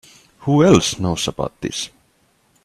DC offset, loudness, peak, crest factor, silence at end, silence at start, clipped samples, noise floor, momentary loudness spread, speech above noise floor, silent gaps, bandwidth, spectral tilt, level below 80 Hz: under 0.1%; -18 LUFS; 0 dBFS; 20 dB; 0.75 s; 0.4 s; under 0.1%; -60 dBFS; 15 LU; 43 dB; none; 14 kHz; -5 dB/octave; -46 dBFS